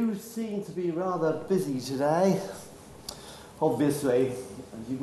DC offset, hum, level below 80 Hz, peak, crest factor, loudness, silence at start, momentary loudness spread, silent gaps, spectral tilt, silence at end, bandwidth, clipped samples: under 0.1%; none; -62 dBFS; -12 dBFS; 16 dB; -28 LUFS; 0 s; 17 LU; none; -6 dB/octave; 0 s; 13 kHz; under 0.1%